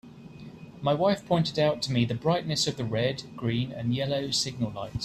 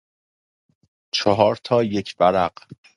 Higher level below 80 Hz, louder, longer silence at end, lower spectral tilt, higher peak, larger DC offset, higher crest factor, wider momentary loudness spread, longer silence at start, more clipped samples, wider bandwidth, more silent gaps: about the same, -56 dBFS vs -54 dBFS; second, -28 LUFS vs -20 LUFS; second, 0 s vs 0.2 s; about the same, -5 dB/octave vs -5.5 dB/octave; second, -12 dBFS vs 0 dBFS; neither; second, 16 dB vs 22 dB; first, 13 LU vs 7 LU; second, 0.05 s vs 1.15 s; neither; first, 13.5 kHz vs 11 kHz; neither